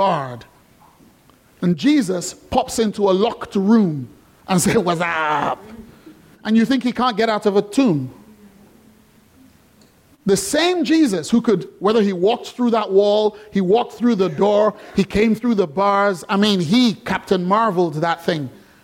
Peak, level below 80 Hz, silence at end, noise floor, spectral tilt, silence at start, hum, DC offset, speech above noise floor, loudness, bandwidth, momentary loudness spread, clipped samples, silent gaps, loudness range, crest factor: -2 dBFS; -50 dBFS; 0.35 s; -52 dBFS; -5.5 dB/octave; 0 s; none; under 0.1%; 35 dB; -18 LUFS; 16.5 kHz; 8 LU; under 0.1%; none; 4 LU; 16 dB